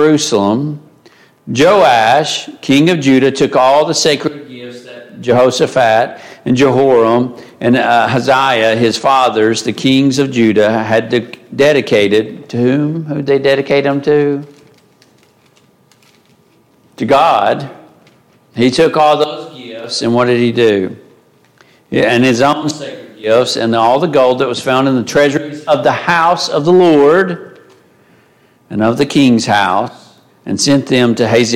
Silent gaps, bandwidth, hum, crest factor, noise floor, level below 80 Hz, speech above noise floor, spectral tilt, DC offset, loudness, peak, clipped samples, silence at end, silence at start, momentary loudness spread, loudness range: none; 15.5 kHz; none; 12 dB; -50 dBFS; -54 dBFS; 39 dB; -5 dB/octave; under 0.1%; -11 LUFS; 0 dBFS; under 0.1%; 0 s; 0 s; 12 LU; 5 LU